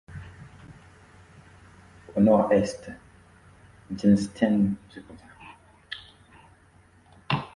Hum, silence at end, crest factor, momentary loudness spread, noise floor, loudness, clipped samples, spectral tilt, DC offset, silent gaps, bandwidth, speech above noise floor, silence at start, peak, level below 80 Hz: none; 0.1 s; 22 dB; 27 LU; -57 dBFS; -24 LUFS; under 0.1%; -7 dB/octave; under 0.1%; none; 11 kHz; 34 dB; 0.1 s; -6 dBFS; -54 dBFS